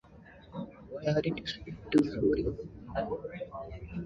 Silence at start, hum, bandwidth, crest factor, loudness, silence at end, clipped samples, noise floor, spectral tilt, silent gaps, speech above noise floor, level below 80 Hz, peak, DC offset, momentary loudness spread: 0.05 s; none; 11 kHz; 20 dB; -34 LUFS; 0 s; under 0.1%; -54 dBFS; -7.5 dB/octave; none; 22 dB; -50 dBFS; -14 dBFS; under 0.1%; 15 LU